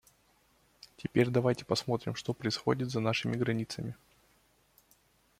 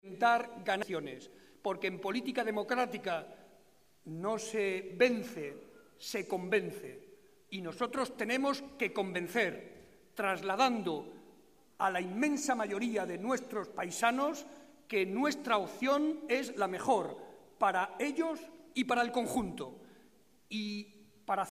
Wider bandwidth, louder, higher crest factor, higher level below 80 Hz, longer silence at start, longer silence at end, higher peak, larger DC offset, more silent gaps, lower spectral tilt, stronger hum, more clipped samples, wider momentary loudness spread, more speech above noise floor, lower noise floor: about the same, 15.5 kHz vs 15.5 kHz; about the same, -32 LUFS vs -34 LUFS; about the same, 22 dB vs 22 dB; first, -66 dBFS vs -72 dBFS; first, 1 s vs 0.05 s; first, 1.45 s vs 0 s; about the same, -12 dBFS vs -14 dBFS; neither; neither; first, -6 dB/octave vs -4 dB/octave; neither; neither; second, 12 LU vs 15 LU; first, 37 dB vs 33 dB; about the same, -68 dBFS vs -67 dBFS